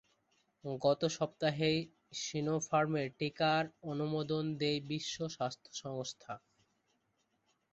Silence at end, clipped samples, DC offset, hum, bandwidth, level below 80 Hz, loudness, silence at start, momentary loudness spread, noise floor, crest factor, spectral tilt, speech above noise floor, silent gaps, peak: 1.35 s; under 0.1%; under 0.1%; none; 8 kHz; -72 dBFS; -36 LUFS; 0.65 s; 12 LU; -79 dBFS; 20 dB; -4.5 dB/octave; 44 dB; none; -18 dBFS